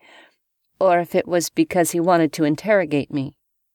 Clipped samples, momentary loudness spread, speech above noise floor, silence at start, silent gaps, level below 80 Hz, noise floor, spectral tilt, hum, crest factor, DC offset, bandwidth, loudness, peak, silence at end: under 0.1%; 7 LU; 50 dB; 0.8 s; none; -62 dBFS; -69 dBFS; -5 dB/octave; none; 16 dB; under 0.1%; 19 kHz; -20 LUFS; -4 dBFS; 0.45 s